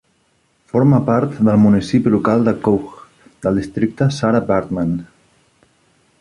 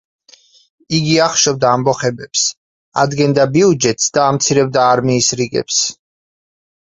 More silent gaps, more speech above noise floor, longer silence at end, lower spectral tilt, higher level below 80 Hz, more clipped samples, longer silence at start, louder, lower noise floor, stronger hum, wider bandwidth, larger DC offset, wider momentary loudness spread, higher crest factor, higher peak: second, none vs 2.57-2.92 s; first, 46 dB vs 34 dB; first, 1.15 s vs 0.9 s; first, -8 dB/octave vs -3.5 dB/octave; first, -46 dBFS vs -52 dBFS; neither; second, 0.75 s vs 0.9 s; about the same, -16 LUFS vs -14 LUFS; first, -61 dBFS vs -48 dBFS; neither; first, 11 kHz vs 8.4 kHz; neither; first, 9 LU vs 6 LU; about the same, 14 dB vs 16 dB; about the same, -2 dBFS vs 0 dBFS